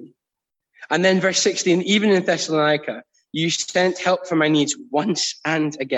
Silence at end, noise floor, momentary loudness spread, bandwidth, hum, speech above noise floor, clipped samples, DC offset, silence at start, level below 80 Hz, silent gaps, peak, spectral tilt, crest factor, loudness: 0 s; -84 dBFS; 7 LU; 8.6 kHz; none; 65 dB; under 0.1%; under 0.1%; 0 s; -68 dBFS; none; -4 dBFS; -3.5 dB/octave; 16 dB; -19 LUFS